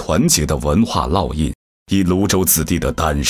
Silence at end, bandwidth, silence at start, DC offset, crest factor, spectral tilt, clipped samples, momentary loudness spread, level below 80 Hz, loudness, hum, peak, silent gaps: 0 s; 16 kHz; 0 s; under 0.1%; 16 dB; -4.5 dB/octave; under 0.1%; 8 LU; -28 dBFS; -16 LUFS; none; 0 dBFS; 1.55-1.86 s